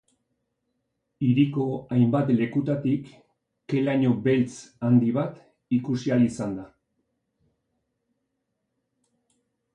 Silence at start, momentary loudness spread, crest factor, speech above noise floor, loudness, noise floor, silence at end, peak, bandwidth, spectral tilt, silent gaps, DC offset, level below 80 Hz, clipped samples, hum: 1.2 s; 9 LU; 18 dB; 56 dB; -24 LUFS; -79 dBFS; 3.1 s; -8 dBFS; 9.8 kHz; -8 dB/octave; none; under 0.1%; -64 dBFS; under 0.1%; none